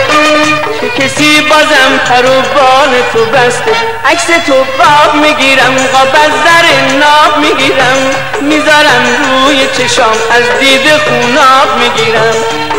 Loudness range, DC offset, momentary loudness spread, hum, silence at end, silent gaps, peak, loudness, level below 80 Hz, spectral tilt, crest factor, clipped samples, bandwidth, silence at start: 1 LU; 6%; 5 LU; none; 0 s; none; 0 dBFS; -6 LUFS; -40 dBFS; -2.5 dB/octave; 8 dB; 1%; 16.5 kHz; 0 s